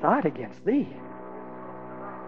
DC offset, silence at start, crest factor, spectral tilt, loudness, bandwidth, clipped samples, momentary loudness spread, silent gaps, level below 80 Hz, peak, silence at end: 0.4%; 0 s; 22 dB; -9 dB/octave; -29 LUFS; 6.4 kHz; under 0.1%; 15 LU; none; -70 dBFS; -6 dBFS; 0 s